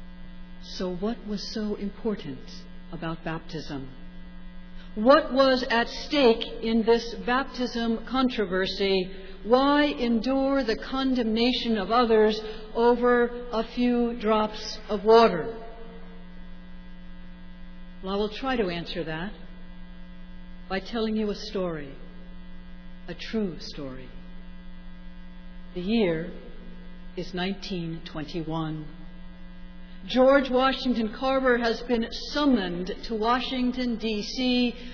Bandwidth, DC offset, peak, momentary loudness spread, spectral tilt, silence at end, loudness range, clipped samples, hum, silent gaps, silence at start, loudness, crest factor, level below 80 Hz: 5.4 kHz; under 0.1%; -6 dBFS; 25 LU; -5.5 dB/octave; 0 s; 11 LU; under 0.1%; none; none; 0 s; -26 LUFS; 22 dB; -42 dBFS